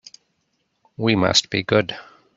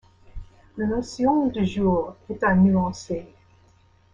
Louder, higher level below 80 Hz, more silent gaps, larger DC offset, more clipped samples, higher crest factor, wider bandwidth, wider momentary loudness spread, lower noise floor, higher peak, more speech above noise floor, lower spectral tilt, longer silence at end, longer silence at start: first, -19 LUFS vs -23 LUFS; second, -56 dBFS vs -46 dBFS; neither; neither; neither; first, 22 dB vs 16 dB; about the same, 8 kHz vs 7.6 kHz; about the same, 12 LU vs 14 LU; first, -71 dBFS vs -57 dBFS; first, 0 dBFS vs -8 dBFS; first, 51 dB vs 35 dB; second, -4 dB/octave vs -7.5 dB/octave; second, 0.35 s vs 0.9 s; first, 1 s vs 0.35 s